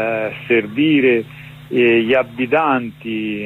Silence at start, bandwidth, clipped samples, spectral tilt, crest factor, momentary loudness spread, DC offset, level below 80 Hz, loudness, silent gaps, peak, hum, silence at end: 0 s; 4.2 kHz; under 0.1%; -7.5 dB/octave; 12 dB; 10 LU; under 0.1%; -56 dBFS; -16 LUFS; none; -4 dBFS; none; 0 s